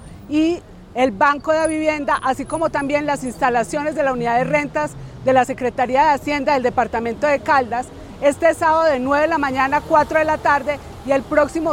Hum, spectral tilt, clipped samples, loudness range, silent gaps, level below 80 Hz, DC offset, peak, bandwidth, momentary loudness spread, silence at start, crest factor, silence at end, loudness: none; -5 dB/octave; under 0.1%; 2 LU; none; -44 dBFS; under 0.1%; -2 dBFS; 16 kHz; 7 LU; 0 s; 16 dB; 0 s; -18 LUFS